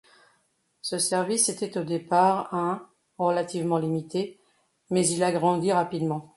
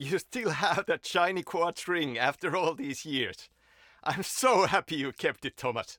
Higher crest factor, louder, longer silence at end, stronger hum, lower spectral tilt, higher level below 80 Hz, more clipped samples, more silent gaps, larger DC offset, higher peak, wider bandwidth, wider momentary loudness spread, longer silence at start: about the same, 18 dB vs 20 dB; first, -26 LUFS vs -29 LUFS; about the same, 0.1 s vs 0.05 s; neither; about the same, -4.5 dB/octave vs -3.5 dB/octave; about the same, -70 dBFS vs -68 dBFS; neither; neither; neither; about the same, -8 dBFS vs -10 dBFS; second, 12 kHz vs 18 kHz; about the same, 9 LU vs 9 LU; first, 0.85 s vs 0 s